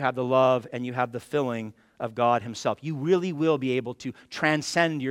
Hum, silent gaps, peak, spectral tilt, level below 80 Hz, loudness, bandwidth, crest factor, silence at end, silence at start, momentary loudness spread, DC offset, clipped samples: none; none; -6 dBFS; -5.5 dB/octave; -70 dBFS; -26 LUFS; 15.5 kHz; 20 dB; 0 s; 0 s; 13 LU; under 0.1%; under 0.1%